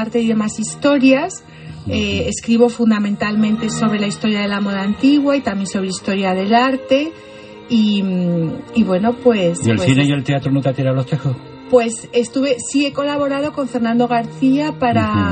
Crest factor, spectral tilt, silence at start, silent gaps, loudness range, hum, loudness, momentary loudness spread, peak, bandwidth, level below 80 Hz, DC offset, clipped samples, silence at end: 16 dB; -5.5 dB/octave; 0 s; none; 2 LU; none; -17 LUFS; 7 LU; 0 dBFS; 8.8 kHz; -48 dBFS; under 0.1%; under 0.1%; 0 s